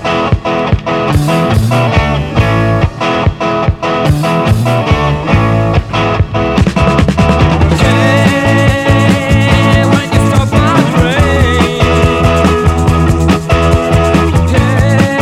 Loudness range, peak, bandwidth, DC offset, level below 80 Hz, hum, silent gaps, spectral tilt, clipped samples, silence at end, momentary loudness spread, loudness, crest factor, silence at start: 3 LU; 0 dBFS; 14.5 kHz; under 0.1%; -20 dBFS; none; none; -6.5 dB/octave; 0.5%; 0 s; 4 LU; -10 LUFS; 10 dB; 0 s